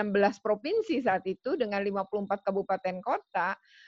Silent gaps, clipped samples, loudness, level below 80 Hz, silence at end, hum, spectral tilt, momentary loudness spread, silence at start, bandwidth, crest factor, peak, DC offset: none; under 0.1%; -30 LUFS; -70 dBFS; 0.35 s; none; -6.5 dB/octave; 5 LU; 0 s; 7.6 kHz; 18 dB; -12 dBFS; under 0.1%